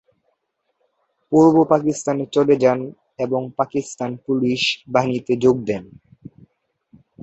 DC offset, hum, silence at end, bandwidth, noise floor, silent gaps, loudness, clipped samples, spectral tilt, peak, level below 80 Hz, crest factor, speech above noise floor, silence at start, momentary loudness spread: under 0.1%; none; 0 s; 8.2 kHz; -72 dBFS; none; -19 LUFS; under 0.1%; -5.5 dB/octave; -2 dBFS; -60 dBFS; 18 dB; 54 dB; 1.3 s; 13 LU